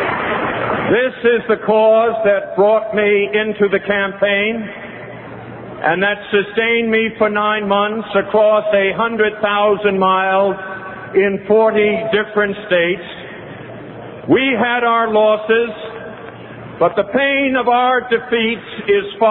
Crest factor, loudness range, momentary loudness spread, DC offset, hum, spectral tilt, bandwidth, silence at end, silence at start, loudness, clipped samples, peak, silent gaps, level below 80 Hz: 14 dB; 3 LU; 18 LU; under 0.1%; none; -9 dB/octave; 4.2 kHz; 0 s; 0 s; -15 LUFS; under 0.1%; -2 dBFS; none; -52 dBFS